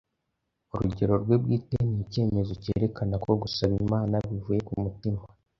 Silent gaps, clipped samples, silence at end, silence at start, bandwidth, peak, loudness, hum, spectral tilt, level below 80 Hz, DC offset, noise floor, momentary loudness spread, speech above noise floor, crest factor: none; under 0.1%; 0.35 s; 0.75 s; 6.6 kHz; -8 dBFS; -28 LUFS; none; -9 dB/octave; -46 dBFS; under 0.1%; -80 dBFS; 7 LU; 53 dB; 18 dB